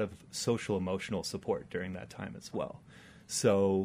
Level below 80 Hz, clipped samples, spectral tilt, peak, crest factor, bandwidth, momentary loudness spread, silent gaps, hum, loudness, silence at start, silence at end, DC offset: -64 dBFS; under 0.1%; -5 dB/octave; -14 dBFS; 20 dB; 15.5 kHz; 15 LU; none; none; -34 LUFS; 0 s; 0 s; under 0.1%